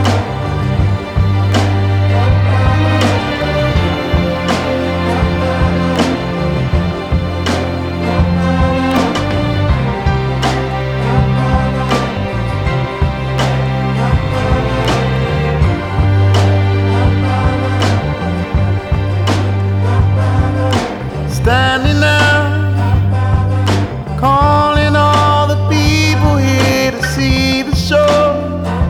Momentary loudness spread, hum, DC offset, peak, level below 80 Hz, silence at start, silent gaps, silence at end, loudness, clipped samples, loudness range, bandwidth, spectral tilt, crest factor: 6 LU; none; under 0.1%; 0 dBFS; -24 dBFS; 0 s; none; 0 s; -13 LUFS; under 0.1%; 3 LU; 13 kHz; -6.5 dB/octave; 12 dB